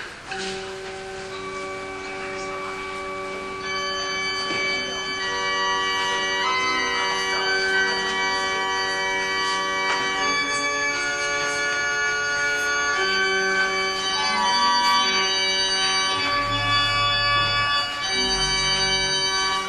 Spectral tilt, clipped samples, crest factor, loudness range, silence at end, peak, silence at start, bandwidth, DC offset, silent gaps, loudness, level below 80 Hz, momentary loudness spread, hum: -1 dB/octave; under 0.1%; 16 dB; 8 LU; 0 s; -8 dBFS; 0 s; 14 kHz; under 0.1%; none; -21 LUFS; -48 dBFS; 11 LU; none